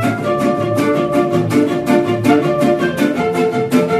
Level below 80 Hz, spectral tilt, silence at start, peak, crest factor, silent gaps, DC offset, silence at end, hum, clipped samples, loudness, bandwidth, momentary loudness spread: -48 dBFS; -6.5 dB/octave; 0 s; 0 dBFS; 14 dB; none; under 0.1%; 0 s; none; under 0.1%; -15 LUFS; 14 kHz; 3 LU